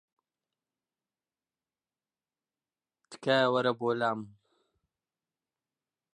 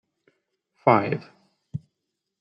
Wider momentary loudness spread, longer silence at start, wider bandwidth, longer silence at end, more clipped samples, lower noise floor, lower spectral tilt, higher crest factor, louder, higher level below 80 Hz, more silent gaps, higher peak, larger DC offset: second, 11 LU vs 19 LU; first, 3.1 s vs 0.85 s; first, 11 kHz vs 6.2 kHz; first, 1.85 s vs 0.6 s; neither; first, under -90 dBFS vs -82 dBFS; second, -5.5 dB/octave vs -9.5 dB/octave; about the same, 24 dB vs 26 dB; second, -29 LUFS vs -23 LUFS; second, -84 dBFS vs -68 dBFS; neither; second, -12 dBFS vs -2 dBFS; neither